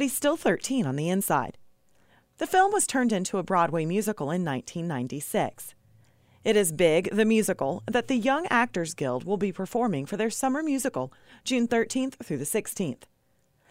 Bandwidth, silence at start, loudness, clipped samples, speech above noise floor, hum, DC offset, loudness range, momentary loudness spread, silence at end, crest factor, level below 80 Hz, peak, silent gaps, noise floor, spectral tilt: 16 kHz; 0 s; -27 LUFS; under 0.1%; 42 dB; none; under 0.1%; 4 LU; 10 LU; 0.75 s; 18 dB; -62 dBFS; -10 dBFS; none; -68 dBFS; -4.5 dB/octave